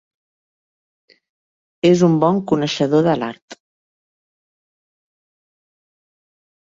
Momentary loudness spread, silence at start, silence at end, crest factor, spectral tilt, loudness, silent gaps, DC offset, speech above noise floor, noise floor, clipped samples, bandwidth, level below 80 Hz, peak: 7 LU; 1.85 s; 3.1 s; 20 dB; -6.5 dB/octave; -16 LUFS; 3.42-3.48 s; under 0.1%; over 74 dB; under -90 dBFS; under 0.1%; 7.8 kHz; -60 dBFS; -2 dBFS